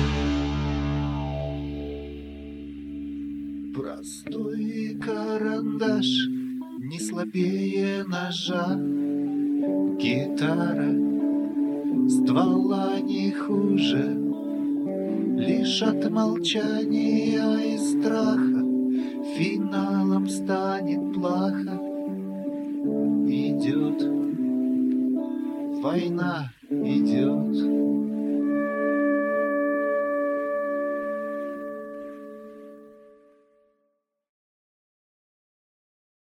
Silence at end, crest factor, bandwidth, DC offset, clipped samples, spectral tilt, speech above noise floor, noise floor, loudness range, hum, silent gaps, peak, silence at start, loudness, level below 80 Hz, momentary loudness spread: 3.4 s; 16 dB; 12 kHz; under 0.1%; under 0.1%; -6 dB/octave; 51 dB; -75 dBFS; 8 LU; none; none; -10 dBFS; 0 s; -25 LUFS; -46 dBFS; 11 LU